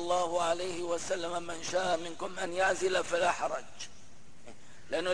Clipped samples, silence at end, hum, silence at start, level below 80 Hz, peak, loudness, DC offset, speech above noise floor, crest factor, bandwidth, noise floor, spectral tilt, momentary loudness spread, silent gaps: under 0.1%; 0 s; none; 0 s; -64 dBFS; -16 dBFS; -32 LUFS; 0.8%; 25 dB; 16 dB; 10.5 kHz; -58 dBFS; -2.5 dB/octave; 10 LU; none